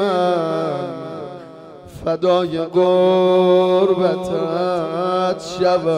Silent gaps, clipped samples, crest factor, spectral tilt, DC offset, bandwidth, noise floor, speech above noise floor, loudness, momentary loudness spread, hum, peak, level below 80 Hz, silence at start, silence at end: none; under 0.1%; 12 dB; -6.5 dB/octave; under 0.1%; 10.5 kHz; -38 dBFS; 22 dB; -17 LUFS; 16 LU; none; -4 dBFS; -54 dBFS; 0 s; 0 s